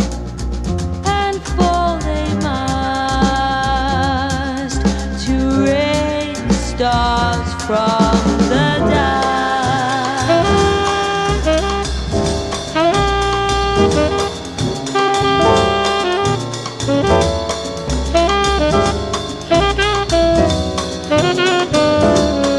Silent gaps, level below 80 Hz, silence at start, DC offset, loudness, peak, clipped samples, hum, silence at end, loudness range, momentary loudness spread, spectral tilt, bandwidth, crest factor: none; -26 dBFS; 0 s; 0.2%; -16 LUFS; 0 dBFS; under 0.1%; none; 0 s; 2 LU; 7 LU; -5 dB/octave; 12 kHz; 16 dB